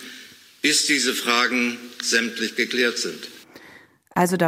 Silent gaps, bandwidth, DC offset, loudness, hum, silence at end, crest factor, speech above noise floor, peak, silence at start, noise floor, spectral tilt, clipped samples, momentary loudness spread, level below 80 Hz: none; 16 kHz; under 0.1%; -21 LUFS; none; 0 s; 18 dB; 28 dB; -4 dBFS; 0 s; -50 dBFS; -2.5 dB/octave; under 0.1%; 15 LU; -70 dBFS